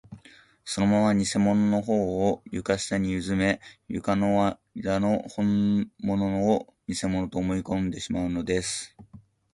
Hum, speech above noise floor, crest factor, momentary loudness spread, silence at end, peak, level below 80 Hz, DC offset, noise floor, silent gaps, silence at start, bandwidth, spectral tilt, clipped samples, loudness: none; 29 dB; 16 dB; 9 LU; 0.35 s; -10 dBFS; -50 dBFS; under 0.1%; -54 dBFS; none; 0.1 s; 11.5 kHz; -5.5 dB/octave; under 0.1%; -26 LUFS